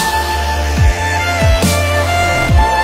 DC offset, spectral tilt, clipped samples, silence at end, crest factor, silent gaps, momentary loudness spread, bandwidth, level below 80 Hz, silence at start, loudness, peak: under 0.1%; -4.5 dB/octave; under 0.1%; 0 s; 12 dB; none; 4 LU; 16.5 kHz; -18 dBFS; 0 s; -13 LUFS; -2 dBFS